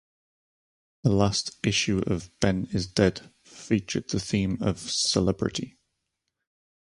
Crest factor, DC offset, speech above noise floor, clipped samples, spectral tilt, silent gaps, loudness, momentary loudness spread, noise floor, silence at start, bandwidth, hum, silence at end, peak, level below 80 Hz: 22 dB; under 0.1%; 56 dB; under 0.1%; -4.5 dB/octave; none; -26 LUFS; 7 LU; -81 dBFS; 1.05 s; 11.5 kHz; none; 1.2 s; -6 dBFS; -48 dBFS